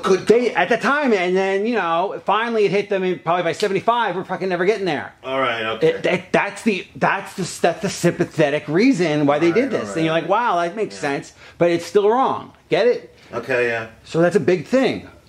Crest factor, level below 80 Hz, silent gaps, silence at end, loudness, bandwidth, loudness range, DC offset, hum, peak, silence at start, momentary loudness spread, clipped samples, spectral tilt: 18 dB; -60 dBFS; none; 0.2 s; -19 LUFS; 14.5 kHz; 2 LU; under 0.1%; none; -2 dBFS; 0 s; 7 LU; under 0.1%; -5.5 dB/octave